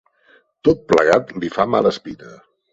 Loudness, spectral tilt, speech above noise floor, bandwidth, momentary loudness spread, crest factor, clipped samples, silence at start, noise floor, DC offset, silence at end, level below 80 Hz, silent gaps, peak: -17 LUFS; -6 dB/octave; 38 dB; 8 kHz; 17 LU; 18 dB; under 0.1%; 0.65 s; -55 dBFS; under 0.1%; 0.4 s; -48 dBFS; none; -2 dBFS